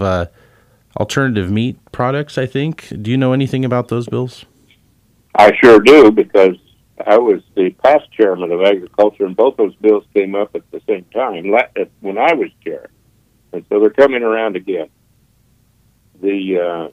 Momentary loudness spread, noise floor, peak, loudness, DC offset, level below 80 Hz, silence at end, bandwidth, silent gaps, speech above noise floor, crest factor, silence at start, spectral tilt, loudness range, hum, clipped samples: 14 LU; -55 dBFS; 0 dBFS; -14 LUFS; under 0.1%; -50 dBFS; 0.05 s; 13.5 kHz; none; 41 dB; 14 dB; 0 s; -6.5 dB/octave; 8 LU; none; 0.1%